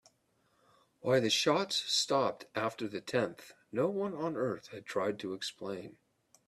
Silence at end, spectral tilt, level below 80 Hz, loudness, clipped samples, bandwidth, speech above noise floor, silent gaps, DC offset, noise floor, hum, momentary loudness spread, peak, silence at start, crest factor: 0.55 s; -3.5 dB/octave; -76 dBFS; -33 LUFS; under 0.1%; 14 kHz; 40 dB; none; under 0.1%; -74 dBFS; none; 14 LU; -14 dBFS; 1.05 s; 20 dB